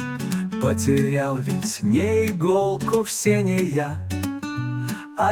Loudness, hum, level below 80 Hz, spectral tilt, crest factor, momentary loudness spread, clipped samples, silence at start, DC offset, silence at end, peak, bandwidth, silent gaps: -23 LUFS; none; -56 dBFS; -6 dB/octave; 16 dB; 8 LU; under 0.1%; 0 s; under 0.1%; 0 s; -6 dBFS; 19 kHz; none